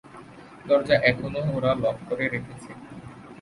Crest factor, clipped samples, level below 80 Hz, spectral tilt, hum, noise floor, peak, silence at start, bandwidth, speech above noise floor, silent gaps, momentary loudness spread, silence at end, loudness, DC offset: 22 dB; under 0.1%; -52 dBFS; -6.5 dB/octave; none; -45 dBFS; -4 dBFS; 0.05 s; 11 kHz; 21 dB; none; 23 LU; 0 s; -24 LUFS; under 0.1%